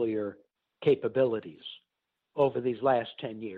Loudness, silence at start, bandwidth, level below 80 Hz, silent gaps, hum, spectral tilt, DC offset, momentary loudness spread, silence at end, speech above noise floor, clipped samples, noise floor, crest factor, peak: -29 LUFS; 0 s; 4.7 kHz; -72 dBFS; none; none; -9 dB/octave; under 0.1%; 15 LU; 0 s; 48 dB; under 0.1%; -77 dBFS; 16 dB; -14 dBFS